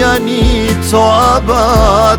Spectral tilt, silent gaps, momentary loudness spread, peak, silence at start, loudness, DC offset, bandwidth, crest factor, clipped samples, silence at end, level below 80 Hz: -5 dB/octave; none; 4 LU; 0 dBFS; 0 s; -10 LUFS; under 0.1%; over 20 kHz; 8 dB; under 0.1%; 0 s; -18 dBFS